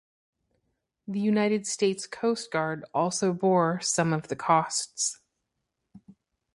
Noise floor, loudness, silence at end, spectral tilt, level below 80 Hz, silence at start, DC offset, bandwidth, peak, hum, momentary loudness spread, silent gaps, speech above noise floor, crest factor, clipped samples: -81 dBFS; -27 LUFS; 0.45 s; -4 dB/octave; -70 dBFS; 1.1 s; under 0.1%; 11.5 kHz; -8 dBFS; none; 6 LU; none; 55 dB; 20 dB; under 0.1%